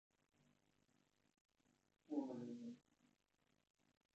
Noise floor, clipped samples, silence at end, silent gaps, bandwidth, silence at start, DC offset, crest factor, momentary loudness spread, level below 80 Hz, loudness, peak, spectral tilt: -85 dBFS; under 0.1%; 1.35 s; none; 8.2 kHz; 2.1 s; under 0.1%; 24 dB; 11 LU; under -90 dBFS; -51 LUFS; -34 dBFS; -7.5 dB/octave